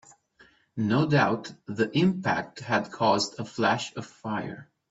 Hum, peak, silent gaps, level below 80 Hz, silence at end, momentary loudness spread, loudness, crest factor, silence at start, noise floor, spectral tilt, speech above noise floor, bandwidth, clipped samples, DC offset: none; -8 dBFS; none; -66 dBFS; 0.25 s; 15 LU; -27 LUFS; 20 dB; 0.75 s; -60 dBFS; -5.5 dB/octave; 33 dB; 8 kHz; under 0.1%; under 0.1%